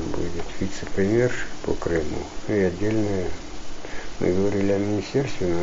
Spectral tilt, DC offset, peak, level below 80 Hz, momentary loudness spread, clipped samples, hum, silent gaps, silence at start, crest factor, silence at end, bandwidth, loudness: -6 dB/octave; under 0.1%; -8 dBFS; -38 dBFS; 13 LU; under 0.1%; none; none; 0 s; 16 dB; 0 s; 7.8 kHz; -25 LUFS